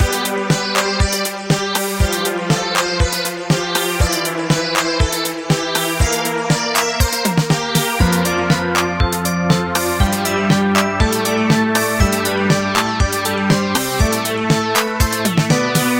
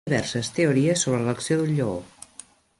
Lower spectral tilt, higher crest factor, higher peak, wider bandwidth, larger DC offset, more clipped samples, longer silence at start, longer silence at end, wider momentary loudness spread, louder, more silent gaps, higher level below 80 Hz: about the same, -4 dB/octave vs -5 dB/octave; about the same, 16 dB vs 16 dB; first, 0 dBFS vs -8 dBFS; first, 17 kHz vs 11.5 kHz; neither; neither; about the same, 0 s vs 0.05 s; second, 0 s vs 0.75 s; second, 3 LU vs 20 LU; first, -16 LUFS vs -23 LUFS; neither; first, -26 dBFS vs -56 dBFS